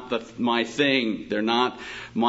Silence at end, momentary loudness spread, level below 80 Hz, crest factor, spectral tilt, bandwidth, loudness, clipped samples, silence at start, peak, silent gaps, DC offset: 0 s; 10 LU; -60 dBFS; 18 dB; -4.5 dB/octave; 8 kHz; -24 LUFS; under 0.1%; 0 s; -6 dBFS; none; under 0.1%